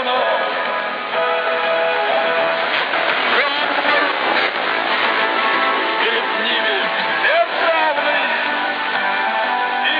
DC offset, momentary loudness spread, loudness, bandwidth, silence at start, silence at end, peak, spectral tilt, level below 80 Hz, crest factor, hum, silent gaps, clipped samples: under 0.1%; 3 LU; -17 LUFS; 5.2 kHz; 0 s; 0 s; -4 dBFS; -4 dB/octave; -80 dBFS; 14 dB; none; none; under 0.1%